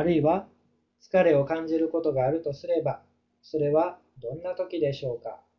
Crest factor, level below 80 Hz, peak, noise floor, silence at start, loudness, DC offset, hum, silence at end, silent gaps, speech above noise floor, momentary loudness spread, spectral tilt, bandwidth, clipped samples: 18 dB; -60 dBFS; -10 dBFS; -68 dBFS; 0 s; -27 LUFS; under 0.1%; none; 0.2 s; none; 42 dB; 13 LU; -8.5 dB/octave; 6.6 kHz; under 0.1%